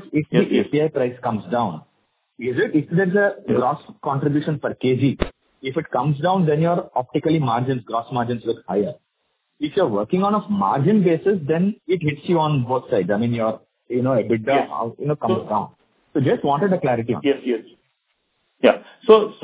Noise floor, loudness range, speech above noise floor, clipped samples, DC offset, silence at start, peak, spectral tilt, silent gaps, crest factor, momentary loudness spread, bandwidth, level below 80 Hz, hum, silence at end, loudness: -72 dBFS; 3 LU; 52 dB; under 0.1%; under 0.1%; 0 s; 0 dBFS; -11.5 dB/octave; none; 20 dB; 8 LU; 4 kHz; -50 dBFS; none; 0.1 s; -21 LUFS